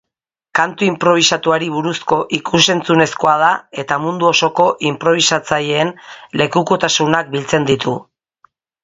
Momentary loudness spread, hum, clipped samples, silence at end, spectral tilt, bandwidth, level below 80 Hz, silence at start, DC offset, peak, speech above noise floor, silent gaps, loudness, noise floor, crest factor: 7 LU; none; under 0.1%; 0.8 s; -3.5 dB/octave; 10.5 kHz; -54 dBFS; 0.55 s; under 0.1%; 0 dBFS; 67 dB; none; -15 LUFS; -82 dBFS; 16 dB